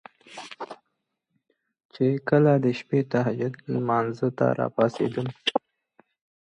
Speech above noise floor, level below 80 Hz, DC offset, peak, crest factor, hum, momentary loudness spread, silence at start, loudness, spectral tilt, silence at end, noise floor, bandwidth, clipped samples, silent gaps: 55 dB; -68 dBFS; under 0.1%; -6 dBFS; 20 dB; none; 18 LU; 0.3 s; -25 LUFS; -7.5 dB/octave; 0.9 s; -79 dBFS; 10 kHz; under 0.1%; 1.85-1.89 s